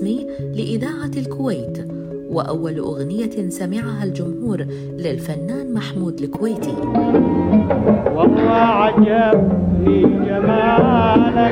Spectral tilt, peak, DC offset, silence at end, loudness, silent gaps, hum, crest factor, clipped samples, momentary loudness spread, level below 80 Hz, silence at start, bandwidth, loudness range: -7.5 dB/octave; 0 dBFS; under 0.1%; 0 s; -17 LUFS; none; none; 16 dB; under 0.1%; 11 LU; -40 dBFS; 0 s; 15 kHz; 9 LU